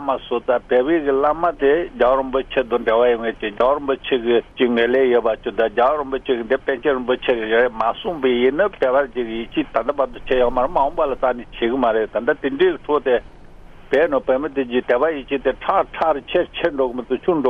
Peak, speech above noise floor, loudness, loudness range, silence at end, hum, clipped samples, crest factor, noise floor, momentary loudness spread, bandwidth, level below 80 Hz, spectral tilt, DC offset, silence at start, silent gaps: -2 dBFS; 21 dB; -19 LUFS; 2 LU; 0 s; none; under 0.1%; 16 dB; -40 dBFS; 5 LU; 5.6 kHz; -42 dBFS; -7 dB/octave; under 0.1%; 0 s; none